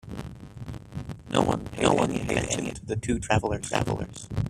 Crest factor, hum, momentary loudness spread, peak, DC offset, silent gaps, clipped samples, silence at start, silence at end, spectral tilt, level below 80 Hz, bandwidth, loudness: 24 dB; none; 15 LU; -4 dBFS; under 0.1%; none; under 0.1%; 0.05 s; 0 s; -5 dB/octave; -44 dBFS; 13.5 kHz; -27 LUFS